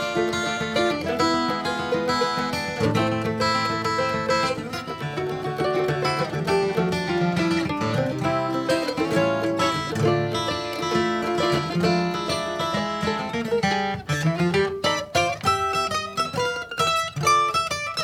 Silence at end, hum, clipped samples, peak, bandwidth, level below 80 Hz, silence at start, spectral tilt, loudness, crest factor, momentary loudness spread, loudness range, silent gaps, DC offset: 0 s; none; under 0.1%; -8 dBFS; 16.5 kHz; -56 dBFS; 0 s; -5 dB/octave; -23 LUFS; 16 dB; 4 LU; 1 LU; none; under 0.1%